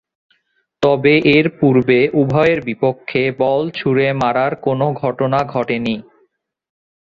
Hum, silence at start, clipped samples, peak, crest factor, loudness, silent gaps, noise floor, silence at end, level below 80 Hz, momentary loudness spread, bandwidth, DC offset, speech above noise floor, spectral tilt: none; 0.8 s; under 0.1%; -2 dBFS; 16 dB; -16 LUFS; none; -65 dBFS; 1.2 s; -52 dBFS; 7 LU; 7.4 kHz; under 0.1%; 50 dB; -8 dB/octave